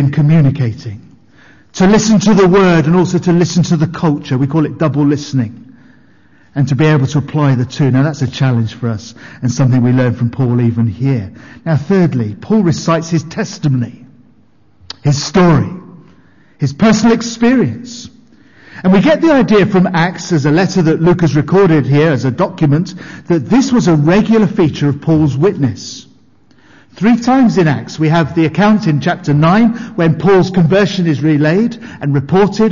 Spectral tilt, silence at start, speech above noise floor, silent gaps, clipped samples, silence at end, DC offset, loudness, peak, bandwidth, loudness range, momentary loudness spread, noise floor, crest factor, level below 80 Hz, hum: -7 dB/octave; 0 s; 39 dB; none; under 0.1%; 0 s; under 0.1%; -12 LUFS; -2 dBFS; 7.4 kHz; 4 LU; 10 LU; -51 dBFS; 10 dB; -42 dBFS; none